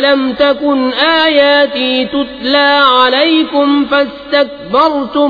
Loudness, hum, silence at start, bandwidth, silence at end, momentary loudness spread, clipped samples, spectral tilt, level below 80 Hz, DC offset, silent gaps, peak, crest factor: -10 LUFS; none; 0 s; 5 kHz; 0 s; 6 LU; under 0.1%; -5 dB/octave; -46 dBFS; under 0.1%; none; 0 dBFS; 10 dB